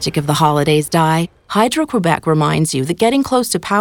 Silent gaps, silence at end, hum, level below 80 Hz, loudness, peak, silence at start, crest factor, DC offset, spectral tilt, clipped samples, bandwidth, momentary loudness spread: none; 0 s; none; -48 dBFS; -15 LUFS; 0 dBFS; 0 s; 14 dB; under 0.1%; -5 dB/octave; under 0.1%; 19 kHz; 3 LU